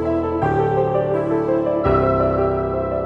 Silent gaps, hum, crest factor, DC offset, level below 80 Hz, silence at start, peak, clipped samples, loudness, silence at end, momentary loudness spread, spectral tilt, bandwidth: none; none; 14 dB; under 0.1%; -36 dBFS; 0 s; -4 dBFS; under 0.1%; -19 LUFS; 0 s; 3 LU; -10 dB/octave; 6.2 kHz